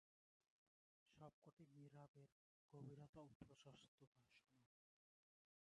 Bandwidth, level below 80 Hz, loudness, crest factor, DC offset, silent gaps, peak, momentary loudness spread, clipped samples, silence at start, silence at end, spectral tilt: 8.2 kHz; -90 dBFS; -66 LUFS; 20 dB; under 0.1%; 1.33-1.42 s, 1.53-1.57 s, 2.08-2.14 s, 2.32-2.69 s, 3.09-3.13 s, 3.35-3.40 s, 3.88-3.98 s, 4.07-4.12 s; -48 dBFS; 6 LU; under 0.1%; 1.05 s; 1 s; -6.5 dB/octave